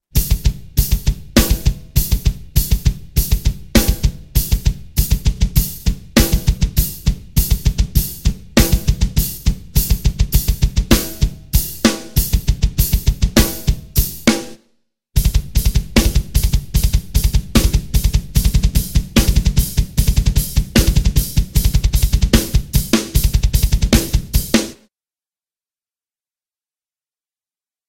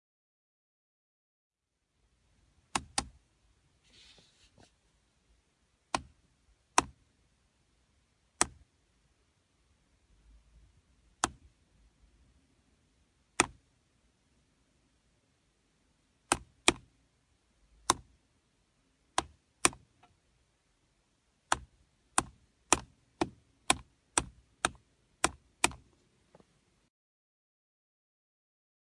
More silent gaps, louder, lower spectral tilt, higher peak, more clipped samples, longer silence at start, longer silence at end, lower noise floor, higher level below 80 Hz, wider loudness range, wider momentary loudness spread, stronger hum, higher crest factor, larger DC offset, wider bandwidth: neither; first, -17 LUFS vs -33 LUFS; first, -4.5 dB/octave vs -1.5 dB/octave; about the same, 0 dBFS vs -2 dBFS; neither; second, 0.15 s vs 2.75 s; about the same, 3.15 s vs 3.2 s; first, under -90 dBFS vs -82 dBFS; first, -18 dBFS vs -60 dBFS; second, 2 LU vs 11 LU; second, 5 LU vs 8 LU; neither; second, 16 dB vs 38 dB; neither; first, 17 kHz vs 11.5 kHz